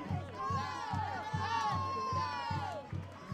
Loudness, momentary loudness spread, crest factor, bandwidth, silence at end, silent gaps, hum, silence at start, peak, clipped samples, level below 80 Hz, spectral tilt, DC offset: -37 LUFS; 7 LU; 14 dB; 12 kHz; 0 s; none; none; 0 s; -24 dBFS; under 0.1%; -62 dBFS; -5.5 dB/octave; under 0.1%